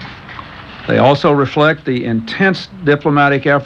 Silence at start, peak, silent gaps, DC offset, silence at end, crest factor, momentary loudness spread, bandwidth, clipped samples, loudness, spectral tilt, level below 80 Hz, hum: 0 s; 0 dBFS; none; under 0.1%; 0 s; 14 dB; 19 LU; 7.8 kHz; under 0.1%; -13 LUFS; -7.5 dB/octave; -46 dBFS; none